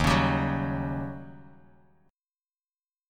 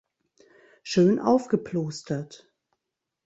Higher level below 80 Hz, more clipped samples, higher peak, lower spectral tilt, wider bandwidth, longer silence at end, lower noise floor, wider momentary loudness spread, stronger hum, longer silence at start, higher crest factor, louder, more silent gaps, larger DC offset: first, -42 dBFS vs -66 dBFS; neither; about the same, -8 dBFS vs -8 dBFS; about the same, -6 dB/octave vs -6.5 dB/octave; first, 15.5 kHz vs 8.2 kHz; first, 1.65 s vs 0.9 s; first, under -90 dBFS vs -85 dBFS; first, 19 LU vs 15 LU; neither; second, 0 s vs 0.85 s; about the same, 22 dB vs 20 dB; second, -28 LUFS vs -25 LUFS; neither; neither